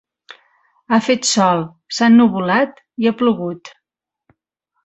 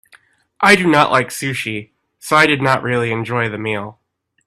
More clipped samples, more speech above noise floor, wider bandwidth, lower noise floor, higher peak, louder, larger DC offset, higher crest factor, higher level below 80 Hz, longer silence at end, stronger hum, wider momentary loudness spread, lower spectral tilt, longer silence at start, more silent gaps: neither; first, 68 dB vs 36 dB; second, 8.2 kHz vs 15 kHz; first, -83 dBFS vs -52 dBFS; about the same, -2 dBFS vs 0 dBFS; about the same, -16 LUFS vs -15 LUFS; neither; about the same, 16 dB vs 18 dB; about the same, -60 dBFS vs -56 dBFS; first, 1.15 s vs 0.55 s; neither; about the same, 12 LU vs 14 LU; about the same, -4.5 dB/octave vs -4.5 dB/octave; first, 0.9 s vs 0.6 s; neither